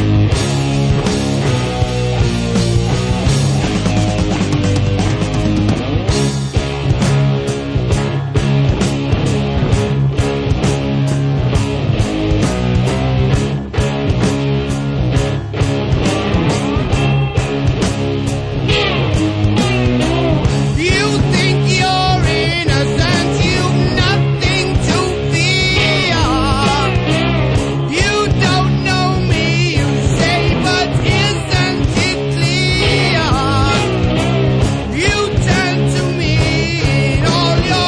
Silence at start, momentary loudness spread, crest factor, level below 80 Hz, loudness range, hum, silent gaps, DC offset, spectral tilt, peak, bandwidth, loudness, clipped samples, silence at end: 0 s; 4 LU; 12 dB; -24 dBFS; 2 LU; none; none; under 0.1%; -5.5 dB/octave; -2 dBFS; 11 kHz; -14 LUFS; under 0.1%; 0 s